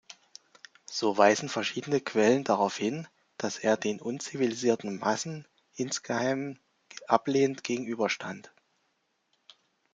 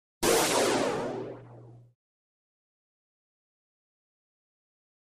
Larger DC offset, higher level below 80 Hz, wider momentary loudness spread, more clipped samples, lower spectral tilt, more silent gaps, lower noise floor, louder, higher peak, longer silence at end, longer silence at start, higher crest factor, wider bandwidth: neither; second, -76 dBFS vs -60 dBFS; first, 21 LU vs 18 LU; neither; first, -4 dB/octave vs -2.5 dB/octave; neither; first, -75 dBFS vs -51 dBFS; about the same, -29 LUFS vs -27 LUFS; first, -6 dBFS vs -12 dBFS; second, 1.45 s vs 3.25 s; about the same, 0.1 s vs 0.2 s; about the same, 24 dB vs 20 dB; second, 9.4 kHz vs 15 kHz